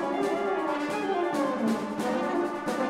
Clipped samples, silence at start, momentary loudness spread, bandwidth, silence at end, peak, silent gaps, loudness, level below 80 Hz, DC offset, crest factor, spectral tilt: under 0.1%; 0 s; 2 LU; 16 kHz; 0 s; -16 dBFS; none; -28 LUFS; -66 dBFS; under 0.1%; 12 dB; -5 dB/octave